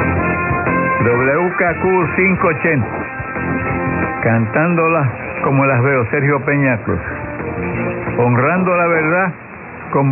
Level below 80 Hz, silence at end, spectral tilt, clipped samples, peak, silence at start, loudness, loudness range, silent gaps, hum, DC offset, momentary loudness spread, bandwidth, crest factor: -40 dBFS; 0 s; -12.5 dB/octave; under 0.1%; -2 dBFS; 0 s; -16 LUFS; 2 LU; none; none; under 0.1%; 8 LU; 3.1 kHz; 14 dB